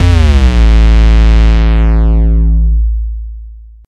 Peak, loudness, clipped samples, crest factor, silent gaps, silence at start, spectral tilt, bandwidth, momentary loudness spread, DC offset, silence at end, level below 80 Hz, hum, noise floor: 0 dBFS; -10 LUFS; 0.1%; 8 dB; none; 0 s; -7 dB/octave; 6.8 kHz; 11 LU; under 0.1%; 0.25 s; -8 dBFS; none; -29 dBFS